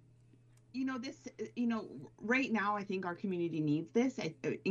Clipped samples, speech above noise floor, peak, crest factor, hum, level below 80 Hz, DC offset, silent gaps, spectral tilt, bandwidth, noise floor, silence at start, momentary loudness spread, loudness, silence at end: under 0.1%; 28 dB; -20 dBFS; 18 dB; none; -78 dBFS; under 0.1%; none; -6 dB/octave; 7.6 kHz; -64 dBFS; 0.75 s; 13 LU; -37 LUFS; 0 s